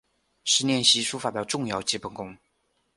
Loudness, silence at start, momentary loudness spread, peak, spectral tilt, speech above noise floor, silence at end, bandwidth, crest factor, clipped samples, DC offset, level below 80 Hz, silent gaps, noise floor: -24 LUFS; 0.45 s; 17 LU; -6 dBFS; -2 dB/octave; 46 dB; 0.6 s; 11.5 kHz; 22 dB; under 0.1%; under 0.1%; -64 dBFS; none; -72 dBFS